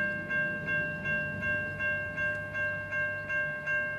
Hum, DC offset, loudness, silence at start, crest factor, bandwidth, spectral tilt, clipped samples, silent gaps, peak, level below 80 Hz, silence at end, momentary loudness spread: none; under 0.1%; -31 LUFS; 0 s; 12 dB; 13 kHz; -6 dB/octave; under 0.1%; none; -20 dBFS; -58 dBFS; 0 s; 2 LU